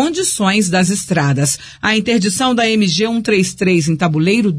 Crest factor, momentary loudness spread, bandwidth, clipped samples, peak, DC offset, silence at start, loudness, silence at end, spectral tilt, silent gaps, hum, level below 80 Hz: 12 dB; 2 LU; 11 kHz; under 0.1%; -2 dBFS; under 0.1%; 0 s; -14 LUFS; 0 s; -4.5 dB/octave; none; none; -48 dBFS